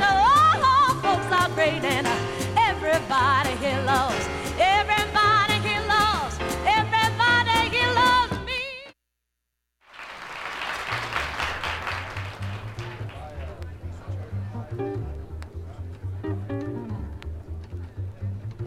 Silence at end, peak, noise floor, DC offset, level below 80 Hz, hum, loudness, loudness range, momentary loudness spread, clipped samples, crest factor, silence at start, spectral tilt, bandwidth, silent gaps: 0 s; -8 dBFS; -80 dBFS; under 0.1%; -42 dBFS; none; -23 LUFS; 14 LU; 19 LU; under 0.1%; 16 dB; 0 s; -4 dB/octave; 17 kHz; none